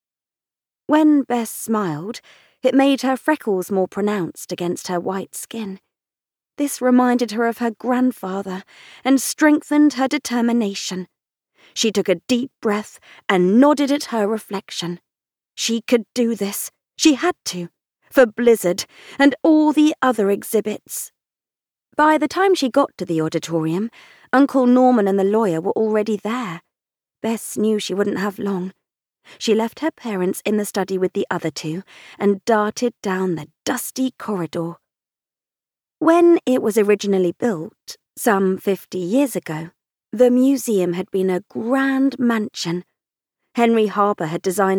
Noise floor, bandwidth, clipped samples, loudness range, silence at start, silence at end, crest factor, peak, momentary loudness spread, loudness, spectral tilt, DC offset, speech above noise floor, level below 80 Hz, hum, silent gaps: under -90 dBFS; 19 kHz; under 0.1%; 5 LU; 0.9 s; 0 s; 16 dB; -4 dBFS; 14 LU; -19 LUFS; -5 dB/octave; under 0.1%; over 71 dB; -66 dBFS; none; none